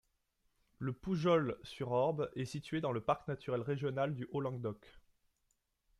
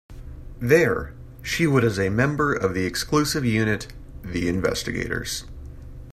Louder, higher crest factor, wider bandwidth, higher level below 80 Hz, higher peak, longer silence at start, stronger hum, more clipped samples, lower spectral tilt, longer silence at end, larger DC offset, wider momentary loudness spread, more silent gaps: second, -37 LUFS vs -23 LUFS; about the same, 20 dB vs 20 dB; second, 12.5 kHz vs 15 kHz; second, -68 dBFS vs -40 dBFS; second, -18 dBFS vs -4 dBFS; first, 0.8 s vs 0.1 s; neither; neither; first, -7.5 dB/octave vs -5 dB/octave; first, 1 s vs 0 s; neither; second, 11 LU vs 22 LU; neither